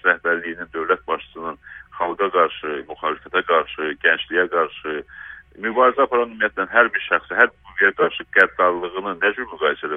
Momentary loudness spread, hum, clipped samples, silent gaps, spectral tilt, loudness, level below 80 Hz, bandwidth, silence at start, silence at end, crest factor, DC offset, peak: 13 LU; none; under 0.1%; none; -5.5 dB/octave; -20 LUFS; -56 dBFS; 5.4 kHz; 0.05 s; 0 s; 20 dB; under 0.1%; 0 dBFS